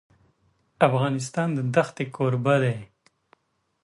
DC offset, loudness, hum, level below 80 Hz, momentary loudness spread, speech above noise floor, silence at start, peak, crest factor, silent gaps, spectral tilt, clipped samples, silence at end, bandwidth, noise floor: under 0.1%; -24 LUFS; none; -66 dBFS; 6 LU; 43 dB; 0.8 s; -4 dBFS; 20 dB; none; -6.5 dB/octave; under 0.1%; 1 s; 11.5 kHz; -67 dBFS